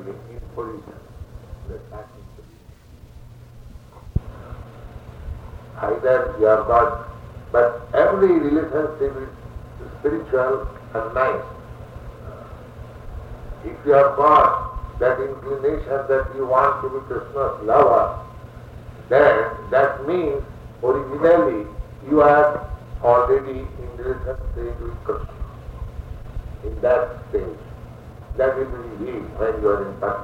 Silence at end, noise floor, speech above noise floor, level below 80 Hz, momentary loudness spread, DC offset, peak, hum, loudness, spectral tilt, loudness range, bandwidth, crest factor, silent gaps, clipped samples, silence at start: 0 s; -44 dBFS; 25 dB; -38 dBFS; 23 LU; under 0.1%; -2 dBFS; none; -20 LUFS; -8 dB/octave; 18 LU; 9 kHz; 20 dB; none; under 0.1%; 0 s